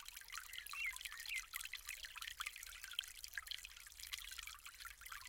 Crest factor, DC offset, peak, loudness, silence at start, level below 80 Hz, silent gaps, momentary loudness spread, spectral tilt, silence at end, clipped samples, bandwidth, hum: 28 dB; under 0.1%; -22 dBFS; -48 LUFS; 0 s; -68 dBFS; none; 9 LU; 2.5 dB/octave; 0 s; under 0.1%; 17 kHz; none